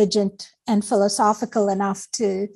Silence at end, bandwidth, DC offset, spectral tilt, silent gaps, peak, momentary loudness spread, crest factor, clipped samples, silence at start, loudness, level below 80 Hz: 0.1 s; 12.5 kHz; under 0.1%; -4.5 dB/octave; none; -6 dBFS; 6 LU; 16 dB; under 0.1%; 0 s; -21 LUFS; -64 dBFS